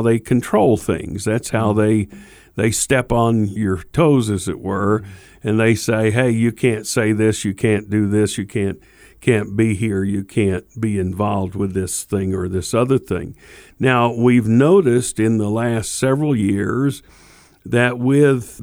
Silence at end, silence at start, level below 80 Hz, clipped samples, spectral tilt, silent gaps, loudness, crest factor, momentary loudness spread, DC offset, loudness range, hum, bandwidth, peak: 0 s; 0 s; -44 dBFS; under 0.1%; -6 dB/octave; none; -18 LUFS; 16 dB; 8 LU; under 0.1%; 4 LU; none; over 20 kHz; -2 dBFS